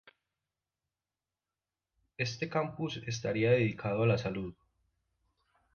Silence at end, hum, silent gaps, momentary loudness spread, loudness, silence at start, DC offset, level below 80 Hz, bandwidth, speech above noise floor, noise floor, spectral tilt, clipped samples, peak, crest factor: 1.2 s; none; none; 10 LU; -32 LUFS; 2.2 s; under 0.1%; -64 dBFS; 6.8 kHz; over 58 dB; under -90 dBFS; -6 dB/octave; under 0.1%; -14 dBFS; 20 dB